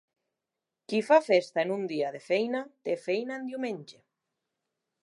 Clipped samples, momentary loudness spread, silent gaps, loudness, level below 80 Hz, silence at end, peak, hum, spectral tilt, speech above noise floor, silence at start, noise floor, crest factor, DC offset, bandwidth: under 0.1%; 12 LU; none; -29 LUFS; -86 dBFS; 1.1 s; -8 dBFS; none; -5 dB/octave; 60 dB; 0.9 s; -88 dBFS; 22 dB; under 0.1%; 11.5 kHz